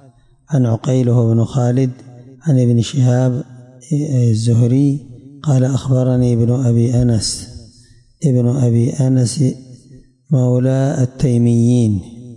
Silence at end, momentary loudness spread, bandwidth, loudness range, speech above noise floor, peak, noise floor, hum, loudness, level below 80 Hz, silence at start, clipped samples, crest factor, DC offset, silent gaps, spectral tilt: 0 s; 8 LU; 11.5 kHz; 2 LU; 33 dB; -4 dBFS; -47 dBFS; none; -15 LUFS; -44 dBFS; 0.5 s; under 0.1%; 10 dB; under 0.1%; none; -7.5 dB/octave